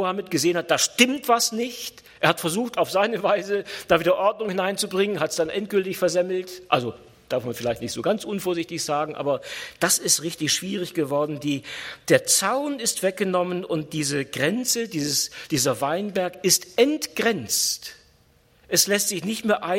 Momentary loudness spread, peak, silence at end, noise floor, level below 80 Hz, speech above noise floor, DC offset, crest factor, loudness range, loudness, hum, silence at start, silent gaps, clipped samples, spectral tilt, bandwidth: 9 LU; -2 dBFS; 0 s; -59 dBFS; -62 dBFS; 35 dB; under 0.1%; 22 dB; 3 LU; -23 LUFS; none; 0 s; none; under 0.1%; -3 dB/octave; 16.5 kHz